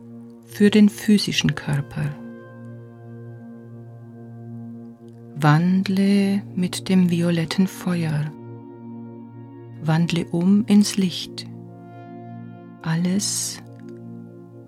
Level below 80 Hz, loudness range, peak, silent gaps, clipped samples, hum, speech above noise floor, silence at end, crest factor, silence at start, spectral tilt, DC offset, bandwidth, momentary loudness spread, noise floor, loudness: -58 dBFS; 8 LU; -4 dBFS; none; under 0.1%; none; 22 dB; 0.05 s; 18 dB; 0 s; -5.5 dB/octave; under 0.1%; 15 kHz; 23 LU; -41 dBFS; -20 LUFS